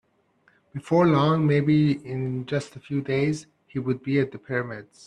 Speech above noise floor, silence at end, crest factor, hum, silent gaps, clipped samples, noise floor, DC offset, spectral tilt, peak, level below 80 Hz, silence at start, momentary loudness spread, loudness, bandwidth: 41 dB; 0.25 s; 16 dB; none; none; under 0.1%; -64 dBFS; under 0.1%; -7.5 dB/octave; -8 dBFS; -62 dBFS; 0.75 s; 14 LU; -24 LUFS; 10 kHz